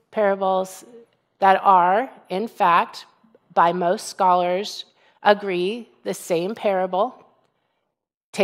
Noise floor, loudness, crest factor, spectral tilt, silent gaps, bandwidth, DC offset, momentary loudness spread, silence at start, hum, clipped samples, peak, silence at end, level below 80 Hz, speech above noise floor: -79 dBFS; -21 LUFS; 20 dB; -4.5 dB/octave; 8.14-8.33 s; 16 kHz; under 0.1%; 14 LU; 0.15 s; none; under 0.1%; 0 dBFS; 0 s; -76 dBFS; 59 dB